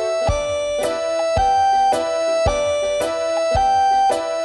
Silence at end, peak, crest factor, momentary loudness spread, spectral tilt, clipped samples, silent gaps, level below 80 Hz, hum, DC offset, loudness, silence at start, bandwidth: 0 s; -6 dBFS; 12 dB; 5 LU; -4 dB/octave; under 0.1%; none; -36 dBFS; none; under 0.1%; -18 LUFS; 0 s; 12.5 kHz